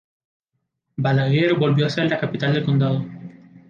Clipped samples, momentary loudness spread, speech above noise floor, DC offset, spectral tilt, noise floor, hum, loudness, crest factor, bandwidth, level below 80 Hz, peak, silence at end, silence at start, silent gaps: under 0.1%; 13 LU; 57 dB; under 0.1%; -8 dB/octave; -76 dBFS; none; -20 LUFS; 14 dB; 7 kHz; -62 dBFS; -6 dBFS; 0.1 s; 1 s; none